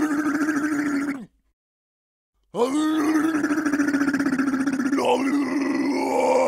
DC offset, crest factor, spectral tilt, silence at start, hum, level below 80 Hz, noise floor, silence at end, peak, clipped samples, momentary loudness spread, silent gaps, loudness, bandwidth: under 0.1%; 14 dB; -4.5 dB/octave; 0 s; none; -64 dBFS; under -90 dBFS; 0 s; -8 dBFS; under 0.1%; 4 LU; 1.53-2.33 s; -23 LUFS; 15.5 kHz